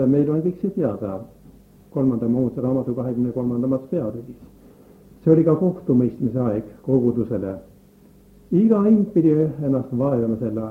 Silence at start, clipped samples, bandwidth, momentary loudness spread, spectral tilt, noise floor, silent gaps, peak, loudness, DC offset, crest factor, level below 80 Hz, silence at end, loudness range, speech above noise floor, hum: 0 s; under 0.1%; 3.3 kHz; 12 LU; -11.5 dB/octave; -50 dBFS; none; -2 dBFS; -21 LUFS; under 0.1%; 18 dB; -54 dBFS; 0 s; 3 LU; 30 dB; none